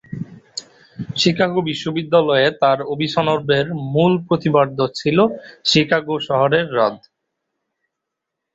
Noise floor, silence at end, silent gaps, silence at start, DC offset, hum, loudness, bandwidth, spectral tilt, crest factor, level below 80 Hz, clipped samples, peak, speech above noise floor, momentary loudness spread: -80 dBFS; 1.55 s; none; 0.1 s; under 0.1%; none; -17 LUFS; 8 kHz; -5.5 dB/octave; 18 dB; -56 dBFS; under 0.1%; -2 dBFS; 63 dB; 13 LU